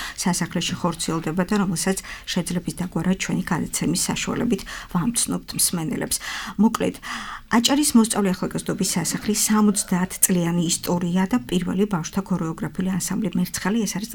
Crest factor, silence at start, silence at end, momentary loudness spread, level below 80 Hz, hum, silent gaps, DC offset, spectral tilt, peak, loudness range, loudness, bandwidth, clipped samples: 22 dB; 0 s; 0 s; 8 LU; -46 dBFS; none; none; under 0.1%; -4 dB/octave; 0 dBFS; 4 LU; -22 LUFS; 19.5 kHz; under 0.1%